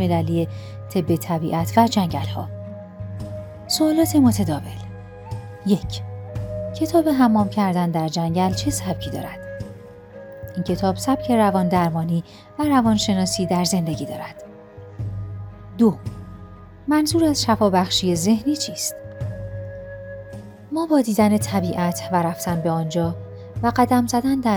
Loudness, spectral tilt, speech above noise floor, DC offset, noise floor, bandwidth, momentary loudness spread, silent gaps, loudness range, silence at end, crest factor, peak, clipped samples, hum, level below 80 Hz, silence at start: -21 LUFS; -5.5 dB/octave; 21 dB; under 0.1%; -41 dBFS; 19.5 kHz; 18 LU; none; 4 LU; 0 s; 20 dB; -2 dBFS; under 0.1%; none; -46 dBFS; 0 s